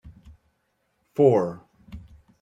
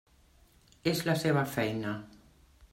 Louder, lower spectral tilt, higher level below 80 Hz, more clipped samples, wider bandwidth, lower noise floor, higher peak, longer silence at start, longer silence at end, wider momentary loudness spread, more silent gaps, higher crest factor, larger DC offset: first, -22 LUFS vs -31 LUFS; first, -9 dB/octave vs -5.5 dB/octave; first, -54 dBFS vs -62 dBFS; neither; second, 7.6 kHz vs 16 kHz; first, -72 dBFS vs -63 dBFS; first, -6 dBFS vs -14 dBFS; second, 0.05 s vs 0.85 s; first, 0.4 s vs 0.05 s; first, 26 LU vs 9 LU; neither; about the same, 20 dB vs 20 dB; neither